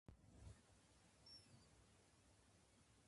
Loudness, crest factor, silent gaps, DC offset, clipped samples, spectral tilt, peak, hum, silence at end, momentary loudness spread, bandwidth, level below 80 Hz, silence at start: -66 LUFS; 22 dB; none; under 0.1%; under 0.1%; -4 dB/octave; -48 dBFS; none; 0 s; 5 LU; 11.5 kHz; -74 dBFS; 0.1 s